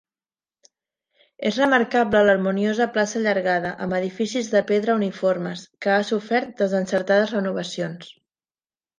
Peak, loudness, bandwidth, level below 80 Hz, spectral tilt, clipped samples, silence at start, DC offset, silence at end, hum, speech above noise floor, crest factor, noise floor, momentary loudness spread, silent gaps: -4 dBFS; -22 LUFS; 9.8 kHz; -62 dBFS; -5 dB/octave; under 0.1%; 1.4 s; under 0.1%; 0.9 s; none; over 69 dB; 20 dB; under -90 dBFS; 9 LU; none